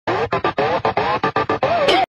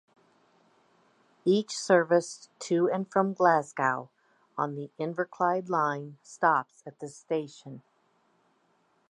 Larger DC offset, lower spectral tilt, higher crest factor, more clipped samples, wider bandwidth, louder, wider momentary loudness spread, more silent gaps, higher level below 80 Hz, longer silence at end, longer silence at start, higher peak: neither; about the same, -5 dB/octave vs -5 dB/octave; second, 16 dB vs 22 dB; neither; first, 15 kHz vs 11.5 kHz; first, -18 LUFS vs -28 LUFS; second, 4 LU vs 19 LU; neither; first, -48 dBFS vs -84 dBFS; second, 0.1 s vs 1.3 s; second, 0.05 s vs 1.45 s; first, -2 dBFS vs -8 dBFS